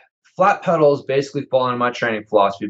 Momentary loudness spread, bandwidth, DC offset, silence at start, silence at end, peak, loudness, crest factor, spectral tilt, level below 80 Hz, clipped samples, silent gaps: 6 LU; 8 kHz; under 0.1%; 0.4 s; 0 s; -2 dBFS; -18 LUFS; 16 dB; -6 dB/octave; -74 dBFS; under 0.1%; none